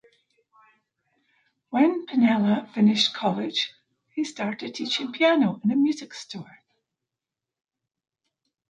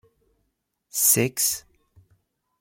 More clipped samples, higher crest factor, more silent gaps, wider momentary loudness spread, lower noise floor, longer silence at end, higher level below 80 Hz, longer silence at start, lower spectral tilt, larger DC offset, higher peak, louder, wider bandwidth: neither; about the same, 18 dB vs 22 dB; neither; about the same, 14 LU vs 14 LU; first, -88 dBFS vs -75 dBFS; first, 2.25 s vs 1 s; second, -76 dBFS vs -66 dBFS; first, 1.7 s vs 0.95 s; first, -5 dB/octave vs -2.5 dB/octave; neither; about the same, -8 dBFS vs -6 dBFS; second, -24 LUFS vs -21 LUFS; second, 9 kHz vs 16.5 kHz